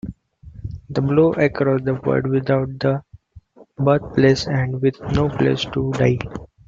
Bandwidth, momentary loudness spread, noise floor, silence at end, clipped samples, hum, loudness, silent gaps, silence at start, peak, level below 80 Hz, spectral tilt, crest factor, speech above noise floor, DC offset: 7.6 kHz; 11 LU; -47 dBFS; 0.2 s; under 0.1%; none; -19 LUFS; none; 0.05 s; -2 dBFS; -44 dBFS; -7.5 dB/octave; 18 dB; 28 dB; under 0.1%